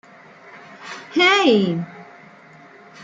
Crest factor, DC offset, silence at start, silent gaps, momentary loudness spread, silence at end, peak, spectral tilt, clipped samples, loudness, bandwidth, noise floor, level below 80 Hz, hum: 18 dB; under 0.1%; 0.55 s; none; 22 LU; 0 s; -4 dBFS; -4.5 dB/octave; under 0.1%; -17 LUFS; 8.8 kHz; -46 dBFS; -70 dBFS; none